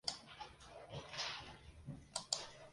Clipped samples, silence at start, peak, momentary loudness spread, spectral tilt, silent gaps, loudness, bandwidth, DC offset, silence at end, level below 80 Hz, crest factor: under 0.1%; 0.05 s; -18 dBFS; 14 LU; -1.5 dB/octave; none; -47 LUFS; 11.5 kHz; under 0.1%; 0 s; -66 dBFS; 32 dB